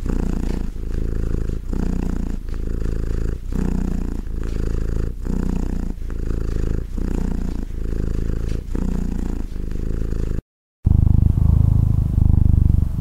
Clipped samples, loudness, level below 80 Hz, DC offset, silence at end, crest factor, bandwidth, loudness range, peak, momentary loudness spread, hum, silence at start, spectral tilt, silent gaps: under 0.1%; -23 LUFS; -22 dBFS; under 0.1%; 0 s; 18 dB; 8.2 kHz; 7 LU; -2 dBFS; 12 LU; none; 0 s; -9 dB/octave; 10.42-10.83 s